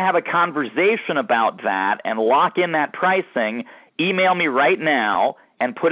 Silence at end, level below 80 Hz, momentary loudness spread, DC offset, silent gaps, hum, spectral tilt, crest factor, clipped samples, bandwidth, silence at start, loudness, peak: 0 s; -70 dBFS; 6 LU; under 0.1%; none; none; -8.5 dB/octave; 14 dB; under 0.1%; 4 kHz; 0 s; -19 LUFS; -6 dBFS